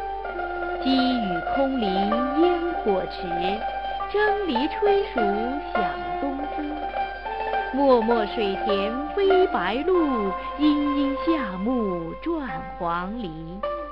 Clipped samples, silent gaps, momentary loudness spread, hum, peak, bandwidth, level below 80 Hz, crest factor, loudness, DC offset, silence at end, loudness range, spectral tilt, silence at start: under 0.1%; none; 9 LU; none; -6 dBFS; 5.6 kHz; -44 dBFS; 18 dB; -24 LUFS; 0.4%; 0 s; 3 LU; -8 dB/octave; 0 s